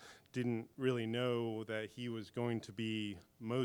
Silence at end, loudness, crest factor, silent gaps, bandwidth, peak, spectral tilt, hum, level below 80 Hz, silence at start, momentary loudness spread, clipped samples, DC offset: 0 s; -40 LUFS; 18 dB; none; 17.5 kHz; -22 dBFS; -6.5 dB/octave; none; -78 dBFS; 0 s; 7 LU; under 0.1%; under 0.1%